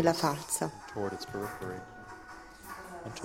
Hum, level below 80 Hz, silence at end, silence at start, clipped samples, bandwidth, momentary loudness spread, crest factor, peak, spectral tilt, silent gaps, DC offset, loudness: none; -62 dBFS; 0 s; 0 s; under 0.1%; 16.5 kHz; 17 LU; 26 dB; -10 dBFS; -4 dB/octave; none; under 0.1%; -36 LUFS